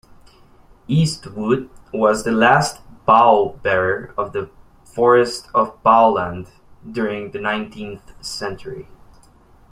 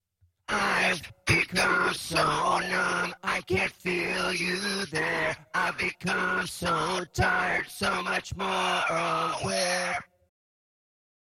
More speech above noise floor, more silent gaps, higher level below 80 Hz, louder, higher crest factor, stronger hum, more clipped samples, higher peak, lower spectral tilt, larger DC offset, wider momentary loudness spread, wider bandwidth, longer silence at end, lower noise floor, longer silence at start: first, 32 dB vs 20 dB; neither; about the same, -48 dBFS vs -52 dBFS; first, -18 LUFS vs -27 LUFS; about the same, 18 dB vs 20 dB; neither; neither; first, -2 dBFS vs -10 dBFS; first, -5.5 dB/octave vs -3.5 dB/octave; neither; first, 19 LU vs 6 LU; about the same, 15.5 kHz vs 16.5 kHz; second, 0.9 s vs 1.2 s; about the same, -49 dBFS vs -48 dBFS; first, 0.9 s vs 0.5 s